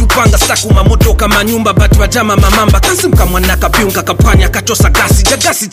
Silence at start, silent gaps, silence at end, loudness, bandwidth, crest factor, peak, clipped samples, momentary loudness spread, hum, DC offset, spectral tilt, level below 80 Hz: 0 s; none; 0.05 s; -9 LUFS; 16 kHz; 8 dB; 0 dBFS; under 0.1%; 3 LU; none; 0.4%; -4 dB/octave; -12 dBFS